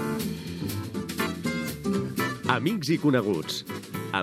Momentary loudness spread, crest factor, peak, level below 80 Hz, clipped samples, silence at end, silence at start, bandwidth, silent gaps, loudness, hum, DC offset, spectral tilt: 9 LU; 24 dB; -4 dBFS; -56 dBFS; under 0.1%; 0 s; 0 s; 17 kHz; none; -28 LUFS; none; under 0.1%; -5.5 dB/octave